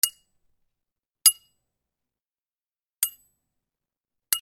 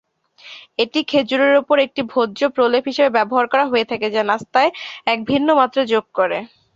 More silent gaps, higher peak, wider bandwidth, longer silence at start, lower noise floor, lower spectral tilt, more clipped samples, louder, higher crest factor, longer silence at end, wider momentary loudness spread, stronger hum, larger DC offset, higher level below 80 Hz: first, 2.22-2.26 s, 2.34-2.83 s vs none; about the same, -2 dBFS vs -2 dBFS; first, over 20 kHz vs 7.6 kHz; second, 0.05 s vs 0.45 s; first, under -90 dBFS vs -44 dBFS; second, 5 dB/octave vs -5 dB/octave; neither; second, -22 LUFS vs -17 LUFS; first, 30 dB vs 16 dB; second, 0.05 s vs 0.3 s; first, 9 LU vs 6 LU; neither; neither; second, -78 dBFS vs -62 dBFS